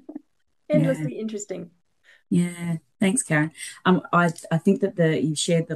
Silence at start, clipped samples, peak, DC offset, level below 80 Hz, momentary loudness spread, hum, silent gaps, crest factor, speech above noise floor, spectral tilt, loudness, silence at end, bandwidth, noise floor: 0.1 s; under 0.1%; -6 dBFS; under 0.1%; -68 dBFS; 11 LU; none; none; 18 dB; 42 dB; -5.5 dB/octave; -23 LUFS; 0 s; 12.5 kHz; -65 dBFS